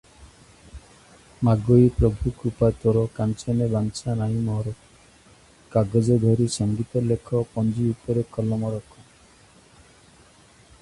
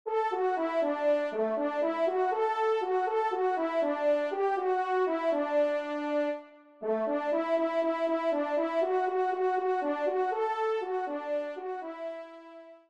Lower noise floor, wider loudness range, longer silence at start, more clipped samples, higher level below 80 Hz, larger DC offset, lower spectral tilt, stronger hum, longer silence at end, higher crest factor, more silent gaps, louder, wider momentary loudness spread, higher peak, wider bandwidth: about the same, -53 dBFS vs -50 dBFS; first, 5 LU vs 2 LU; first, 0.2 s vs 0.05 s; neither; first, -42 dBFS vs -82 dBFS; neither; first, -8 dB/octave vs -5 dB/octave; neither; first, 2 s vs 0.15 s; first, 20 dB vs 12 dB; neither; first, -23 LUFS vs -30 LUFS; about the same, 9 LU vs 8 LU; first, -4 dBFS vs -18 dBFS; first, 11.5 kHz vs 8.8 kHz